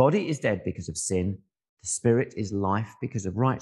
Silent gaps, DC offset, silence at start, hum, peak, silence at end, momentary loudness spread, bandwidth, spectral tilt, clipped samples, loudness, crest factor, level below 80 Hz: 1.69-1.77 s; under 0.1%; 0 s; none; -6 dBFS; 0 s; 9 LU; 12.5 kHz; -5.5 dB/octave; under 0.1%; -28 LUFS; 20 dB; -48 dBFS